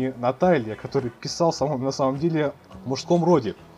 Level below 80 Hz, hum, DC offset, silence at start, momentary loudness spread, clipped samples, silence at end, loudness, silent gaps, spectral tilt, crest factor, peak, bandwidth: -56 dBFS; none; under 0.1%; 0 s; 10 LU; under 0.1%; 0.15 s; -23 LUFS; none; -6 dB/octave; 18 dB; -6 dBFS; 11 kHz